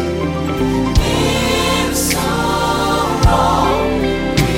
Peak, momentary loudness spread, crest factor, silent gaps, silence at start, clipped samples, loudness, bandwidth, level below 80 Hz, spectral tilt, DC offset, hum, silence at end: 0 dBFS; 4 LU; 14 dB; none; 0 s; under 0.1%; -15 LUFS; 17 kHz; -24 dBFS; -4.5 dB/octave; under 0.1%; none; 0 s